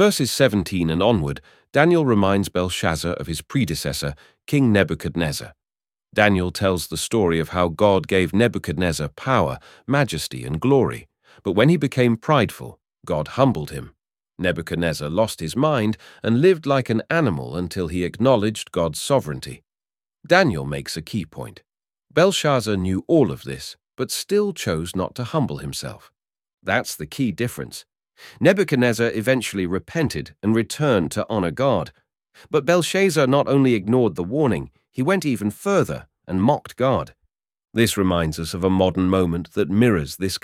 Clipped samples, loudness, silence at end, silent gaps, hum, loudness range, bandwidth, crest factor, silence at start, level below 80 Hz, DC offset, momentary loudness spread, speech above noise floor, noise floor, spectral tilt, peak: under 0.1%; -21 LUFS; 0.05 s; 26.54-26.58 s; none; 4 LU; 16.5 kHz; 20 dB; 0 s; -46 dBFS; under 0.1%; 11 LU; over 70 dB; under -90 dBFS; -5.5 dB/octave; -2 dBFS